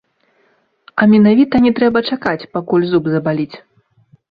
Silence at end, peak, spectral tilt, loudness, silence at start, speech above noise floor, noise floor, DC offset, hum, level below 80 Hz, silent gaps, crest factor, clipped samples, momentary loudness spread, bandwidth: 0.75 s; -2 dBFS; -9 dB/octave; -14 LUFS; 0.95 s; 45 dB; -59 dBFS; under 0.1%; none; -50 dBFS; none; 14 dB; under 0.1%; 12 LU; 5 kHz